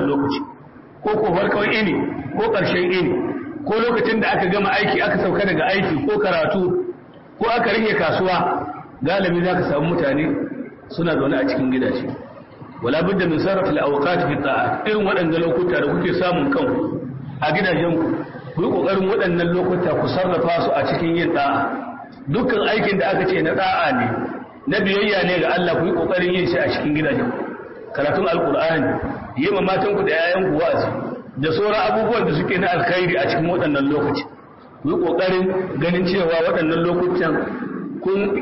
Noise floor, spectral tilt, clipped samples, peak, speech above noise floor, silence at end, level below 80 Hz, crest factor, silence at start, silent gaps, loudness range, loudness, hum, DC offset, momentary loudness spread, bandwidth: -42 dBFS; -10.5 dB/octave; under 0.1%; -8 dBFS; 24 dB; 0 s; -48 dBFS; 12 dB; 0 s; none; 2 LU; -19 LUFS; none; 0.2%; 9 LU; 5.8 kHz